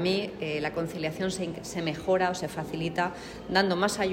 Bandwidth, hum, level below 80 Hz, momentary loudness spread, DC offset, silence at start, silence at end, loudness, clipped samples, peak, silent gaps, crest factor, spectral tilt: 16 kHz; none; -56 dBFS; 8 LU; under 0.1%; 0 s; 0 s; -29 LUFS; under 0.1%; -8 dBFS; none; 20 dB; -4.5 dB/octave